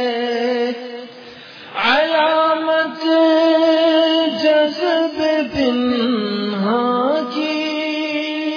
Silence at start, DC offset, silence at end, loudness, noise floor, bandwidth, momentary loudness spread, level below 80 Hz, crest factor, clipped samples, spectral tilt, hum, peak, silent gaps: 0 s; under 0.1%; 0 s; -17 LUFS; -38 dBFS; 5.4 kHz; 9 LU; -56 dBFS; 12 dB; under 0.1%; -5.5 dB/octave; none; -4 dBFS; none